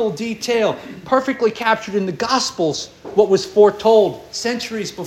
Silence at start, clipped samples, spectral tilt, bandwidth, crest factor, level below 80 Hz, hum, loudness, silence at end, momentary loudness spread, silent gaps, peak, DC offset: 0 s; under 0.1%; -4 dB/octave; 13.5 kHz; 16 dB; -56 dBFS; none; -18 LUFS; 0 s; 10 LU; none; -2 dBFS; under 0.1%